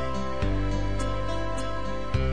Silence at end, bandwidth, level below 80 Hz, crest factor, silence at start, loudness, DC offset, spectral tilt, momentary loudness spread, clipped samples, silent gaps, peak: 0 s; 10 kHz; -32 dBFS; 14 dB; 0 s; -30 LUFS; 3%; -6.5 dB/octave; 3 LU; under 0.1%; none; -12 dBFS